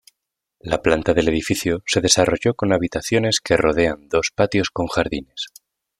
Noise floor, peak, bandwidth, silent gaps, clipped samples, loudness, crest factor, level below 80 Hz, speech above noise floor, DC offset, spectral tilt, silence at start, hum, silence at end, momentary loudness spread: -79 dBFS; -2 dBFS; 15.5 kHz; none; under 0.1%; -19 LUFS; 18 dB; -44 dBFS; 60 dB; under 0.1%; -4 dB/octave; 0.65 s; none; 0.5 s; 10 LU